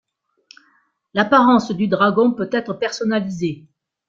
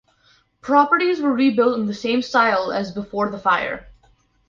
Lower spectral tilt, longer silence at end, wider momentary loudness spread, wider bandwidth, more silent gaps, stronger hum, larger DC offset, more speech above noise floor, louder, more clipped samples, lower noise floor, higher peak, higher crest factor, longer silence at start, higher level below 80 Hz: about the same, -6 dB/octave vs -5.5 dB/octave; about the same, 0.5 s vs 0.55 s; about the same, 12 LU vs 10 LU; about the same, 7.6 kHz vs 7.2 kHz; neither; neither; neither; first, 44 dB vs 40 dB; about the same, -18 LUFS vs -19 LUFS; neither; about the same, -61 dBFS vs -59 dBFS; about the same, -2 dBFS vs -4 dBFS; about the same, 18 dB vs 16 dB; first, 1.15 s vs 0.65 s; about the same, -60 dBFS vs -56 dBFS